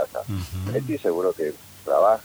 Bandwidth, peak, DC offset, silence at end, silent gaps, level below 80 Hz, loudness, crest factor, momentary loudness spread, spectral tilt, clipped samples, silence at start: over 20 kHz; -8 dBFS; under 0.1%; 0 s; none; -52 dBFS; -25 LUFS; 16 dB; 11 LU; -7 dB/octave; under 0.1%; 0 s